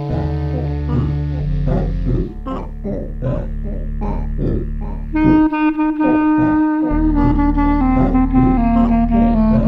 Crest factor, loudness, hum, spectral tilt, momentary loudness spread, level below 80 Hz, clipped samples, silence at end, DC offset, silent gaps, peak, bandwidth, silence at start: 14 dB; -17 LUFS; none; -10.5 dB/octave; 11 LU; -22 dBFS; under 0.1%; 0 s; under 0.1%; none; 0 dBFS; 5.2 kHz; 0 s